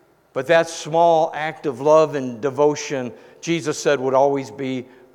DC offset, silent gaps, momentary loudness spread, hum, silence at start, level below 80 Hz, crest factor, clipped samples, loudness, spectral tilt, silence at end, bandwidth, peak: under 0.1%; none; 12 LU; none; 0.35 s; -70 dBFS; 16 dB; under 0.1%; -20 LUFS; -4.5 dB/octave; 0.3 s; 13 kHz; -2 dBFS